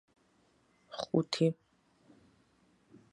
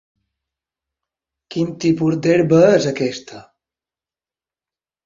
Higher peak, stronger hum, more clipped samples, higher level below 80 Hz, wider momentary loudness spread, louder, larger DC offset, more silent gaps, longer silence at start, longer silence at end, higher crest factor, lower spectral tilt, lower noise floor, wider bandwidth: second, -14 dBFS vs -2 dBFS; neither; neither; second, -78 dBFS vs -58 dBFS; first, 18 LU vs 12 LU; second, -33 LUFS vs -16 LUFS; neither; neither; second, 0.9 s vs 1.5 s; about the same, 1.6 s vs 1.65 s; first, 24 dB vs 18 dB; about the same, -6 dB/octave vs -6.5 dB/octave; second, -70 dBFS vs under -90 dBFS; first, 11.5 kHz vs 7.6 kHz